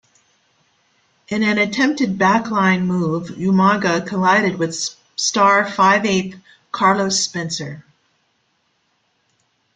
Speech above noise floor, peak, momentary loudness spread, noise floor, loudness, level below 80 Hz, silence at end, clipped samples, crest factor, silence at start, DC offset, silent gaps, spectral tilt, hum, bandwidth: 48 dB; -2 dBFS; 11 LU; -66 dBFS; -17 LUFS; -58 dBFS; 1.95 s; under 0.1%; 18 dB; 1.3 s; under 0.1%; none; -4 dB/octave; none; 9.4 kHz